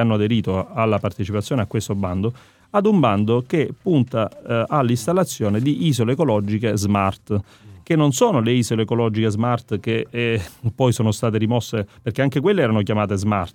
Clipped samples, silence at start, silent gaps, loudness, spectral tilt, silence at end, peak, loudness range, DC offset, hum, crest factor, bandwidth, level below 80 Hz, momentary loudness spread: under 0.1%; 0 s; none; -20 LUFS; -6.5 dB/octave; 0.05 s; -2 dBFS; 1 LU; under 0.1%; none; 18 dB; 17 kHz; -56 dBFS; 6 LU